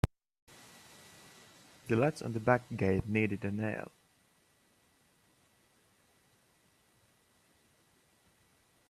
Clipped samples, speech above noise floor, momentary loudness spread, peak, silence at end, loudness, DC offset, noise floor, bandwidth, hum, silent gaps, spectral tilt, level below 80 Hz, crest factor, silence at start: under 0.1%; 38 dB; 25 LU; -10 dBFS; 5.05 s; -33 LUFS; under 0.1%; -70 dBFS; 14 kHz; none; 0.42-0.47 s; -7 dB/octave; -58 dBFS; 28 dB; 0.05 s